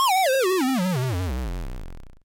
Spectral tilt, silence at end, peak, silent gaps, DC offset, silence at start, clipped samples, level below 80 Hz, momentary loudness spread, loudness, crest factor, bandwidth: -4.5 dB/octave; 0.1 s; -16 dBFS; none; under 0.1%; 0 s; under 0.1%; -36 dBFS; 17 LU; -23 LUFS; 8 dB; 17 kHz